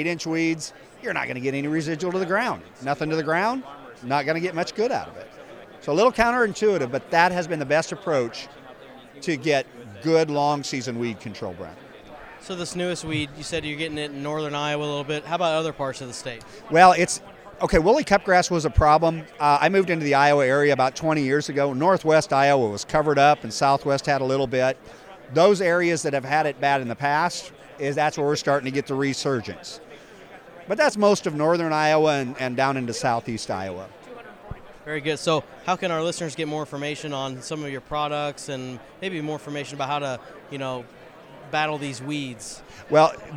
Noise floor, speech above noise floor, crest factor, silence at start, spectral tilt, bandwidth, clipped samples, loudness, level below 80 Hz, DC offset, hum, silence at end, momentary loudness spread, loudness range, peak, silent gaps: -45 dBFS; 22 dB; 24 dB; 0 s; -5 dB/octave; 15.5 kHz; under 0.1%; -23 LUFS; -46 dBFS; under 0.1%; none; 0 s; 17 LU; 10 LU; 0 dBFS; none